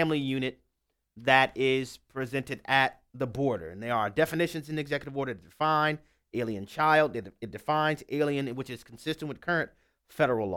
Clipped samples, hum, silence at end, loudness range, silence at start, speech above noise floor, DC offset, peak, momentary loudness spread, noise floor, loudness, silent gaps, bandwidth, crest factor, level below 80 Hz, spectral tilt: under 0.1%; none; 0 s; 2 LU; 0 s; 51 dB; under 0.1%; -6 dBFS; 14 LU; -80 dBFS; -29 LUFS; none; 18 kHz; 24 dB; -62 dBFS; -5.5 dB/octave